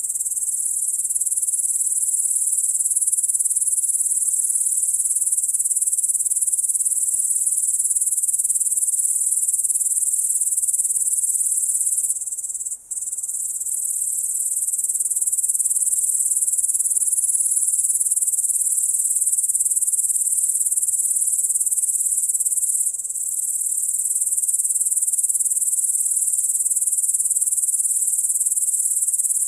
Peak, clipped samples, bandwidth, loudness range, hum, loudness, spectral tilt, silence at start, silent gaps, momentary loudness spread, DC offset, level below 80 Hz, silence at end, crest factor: -2 dBFS; under 0.1%; 16 kHz; 2 LU; none; -18 LUFS; 2 dB/octave; 0 s; none; 3 LU; under 0.1%; -68 dBFS; 0 s; 18 dB